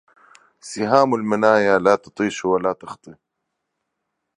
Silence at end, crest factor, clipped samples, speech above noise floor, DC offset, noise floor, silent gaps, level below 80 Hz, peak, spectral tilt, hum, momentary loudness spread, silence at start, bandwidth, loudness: 1.25 s; 20 dB; under 0.1%; 59 dB; under 0.1%; -78 dBFS; none; -62 dBFS; 0 dBFS; -5.5 dB/octave; none; 18 LU; 0.65 s; 11 kHz; -18 LUFS